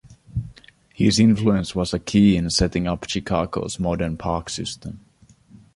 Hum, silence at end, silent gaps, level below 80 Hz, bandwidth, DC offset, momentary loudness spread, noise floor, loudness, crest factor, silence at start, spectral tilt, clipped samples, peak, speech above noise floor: none; 0.75 s; none; -38 dBFS; 11.5 kHz; under 0.1%; 15 LU; -51 dBFS; -21 LUFS; 18 dB; 0.05 s; -5.5 dB/octave; under 0.1%; -4 dBFS; 30 dB